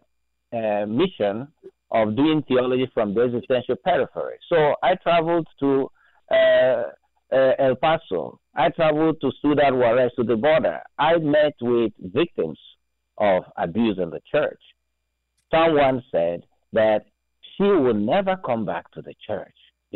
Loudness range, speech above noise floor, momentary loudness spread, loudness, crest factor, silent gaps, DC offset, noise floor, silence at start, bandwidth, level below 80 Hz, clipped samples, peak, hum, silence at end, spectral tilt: 3 LU; 56 dB; 11 LU; -21 LUFS; 10 dB; none; under 0.1%; -76 dBFS; 0.5 s; 4.3 kHz; -56 dBFS; under 0.1%; -12 dBFS; none; 0.5 s; -9.5 dB/octave